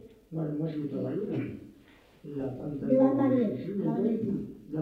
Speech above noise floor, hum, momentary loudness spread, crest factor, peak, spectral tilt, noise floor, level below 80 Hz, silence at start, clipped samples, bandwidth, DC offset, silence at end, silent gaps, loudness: 28 dB; none; 15 LU; 18 dB; -12 dBFS; -10.5 dB/octave; -57 dBFS; -62 dBFS; 0.05 s; under 0.1%; 4.7 kHz; under 0.1%; 0 s; none; -30 LUFS